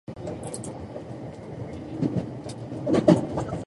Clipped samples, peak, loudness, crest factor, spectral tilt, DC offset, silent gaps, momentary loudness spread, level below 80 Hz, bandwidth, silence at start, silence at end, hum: under 0.1%; -2 dBFS; -27 LUFS; 24 dB; -7 dB/octave; under 0.1%; none; 17 LU; -50 dBFS; 11.5 kHz; 0.1 s; 0 s; none